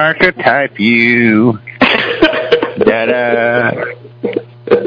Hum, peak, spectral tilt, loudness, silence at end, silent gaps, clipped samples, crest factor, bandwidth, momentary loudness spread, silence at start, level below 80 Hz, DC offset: none; 0 dBFS; -7.5 dB/octave; -11 LUFS; 0 s; none; 0.3%; 12 dB; 5.4 kHz; 12 LU; 0 s; -44 dBFS; under 0.1%